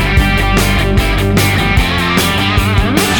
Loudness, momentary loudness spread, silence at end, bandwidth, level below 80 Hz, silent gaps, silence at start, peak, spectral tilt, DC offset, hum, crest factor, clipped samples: -12 LUFS; 1 LU; 0 s; over 20 kHz; -18 dBFS; none; 0 s; 0 dBFS; -4.5 dB/octave; under 0.1%; none; 12 dB; under 0.1%